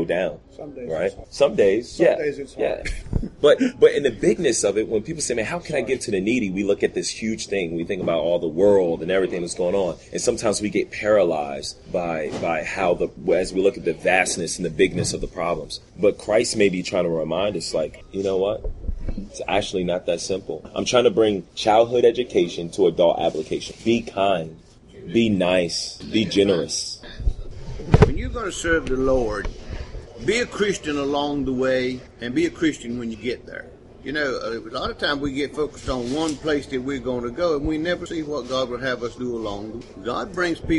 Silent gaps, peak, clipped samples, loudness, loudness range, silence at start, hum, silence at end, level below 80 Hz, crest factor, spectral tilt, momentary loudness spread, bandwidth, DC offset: none; -2 dBFS; under 0.1%; -22 LUFS; 5 LU; 0 s; none; 0 s; -38 dBFS; 20 dB; -4.5 dB/octave; 12 LU; 11.5 kHz; under 0.1%